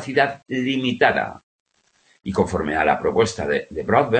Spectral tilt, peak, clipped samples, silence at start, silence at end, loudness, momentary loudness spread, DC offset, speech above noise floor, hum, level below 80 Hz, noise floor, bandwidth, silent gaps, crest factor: -5.5 dB/octave; 0 dBFS; under 0.1%; 0 s; 0 s; -21 LUFS; 7 LU; under 0.1%; 41 dB; none; -48 dBFS; -61 dBFS; 8.8 kHz; 1.43-1.66 s; 20 dB